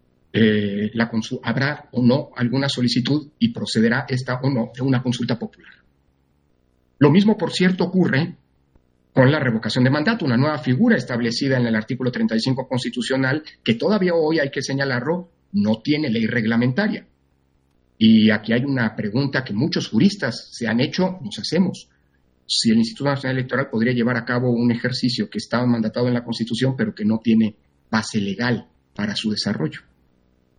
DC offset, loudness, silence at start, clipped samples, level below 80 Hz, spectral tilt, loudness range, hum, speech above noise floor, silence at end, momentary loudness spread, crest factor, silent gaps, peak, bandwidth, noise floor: under 0.1%; -20 LUFS; 0.35 s; under 0.1%; -58 dBFS; -6 dB/octave; 3 LU; none; 43 dB; 0.8 s; 7 LU; 20 dB; none; -2 dBFS; 10 kHz; -63 dBFS